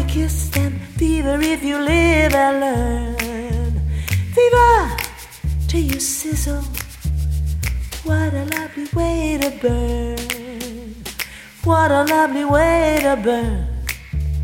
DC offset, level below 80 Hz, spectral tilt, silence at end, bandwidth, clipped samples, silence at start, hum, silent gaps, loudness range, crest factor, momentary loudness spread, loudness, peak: under 0.1%; -26 dBFS; -5.5 dB/octave; 0 s; 17 kHz; under 0.1%; 0 s; none; none; 5 LU; 18 dB; 12 LU; -19 LUFS; -2 dBFS